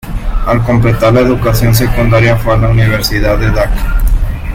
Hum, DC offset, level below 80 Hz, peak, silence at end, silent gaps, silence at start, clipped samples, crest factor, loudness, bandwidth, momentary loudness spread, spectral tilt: none; under 0.1%; -14 dBFS; 0 dBFS; 0 s; none; 0.05 s; under 0.1%; 10 dB; -11 LUFS; 17 kHz; 7 LU; -6.5 dB/octave